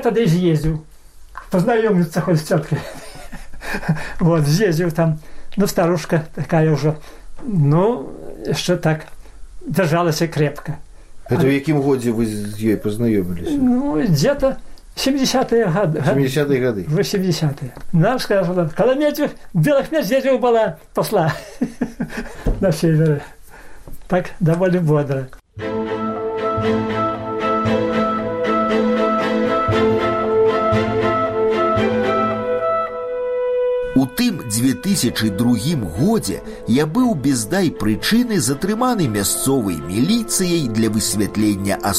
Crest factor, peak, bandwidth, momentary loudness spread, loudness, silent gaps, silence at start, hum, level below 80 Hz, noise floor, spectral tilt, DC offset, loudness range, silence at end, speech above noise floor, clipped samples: 16 dB; -2 dBFS; 16 kHz; 9 LU; -18 LUFS; none; 0 s; none; -38 dBFS; -40 dBFS; -5.5 dB/octave; under 0.1%; 3 LU; 0 s; 22 dB; under 0.1%